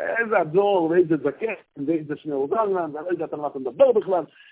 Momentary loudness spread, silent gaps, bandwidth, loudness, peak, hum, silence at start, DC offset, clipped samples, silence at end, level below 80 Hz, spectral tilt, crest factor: 10 LU; none; 4 kHz; -23 LUFS; -4 dBFS; none; 0 s; under 0.1%; under 0.1%; 0.25 s; -68 dBFS; -10.5 dB/octave; 18 dB